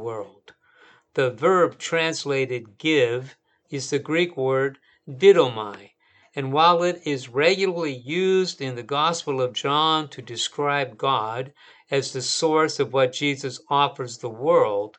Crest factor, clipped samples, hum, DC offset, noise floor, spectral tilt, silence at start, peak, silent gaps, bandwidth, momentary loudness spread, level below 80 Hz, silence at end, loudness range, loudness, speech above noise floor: 20 dB; under 0.1%; none; under 0.1%; -56 dBFS; -4 dB/octave; 0 s; -4 dBFS; none; 9.2 kHz; 13 LU; -76 dBFS; 0.1 s; 3 LU; -22 LUFS; 33 dB